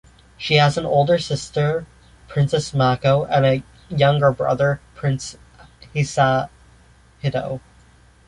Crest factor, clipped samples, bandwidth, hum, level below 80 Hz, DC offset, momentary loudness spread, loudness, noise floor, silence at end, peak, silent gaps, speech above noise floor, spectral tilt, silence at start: 18 dB; under 0.1%; 11 kHz; none; -48 dBFS; under 0.1%; 12 LU; -20 LUFS; -51 dBFS; 0.7 s; -2 dBFS; none; 32 dB; -6 dB/octave; 0.4 s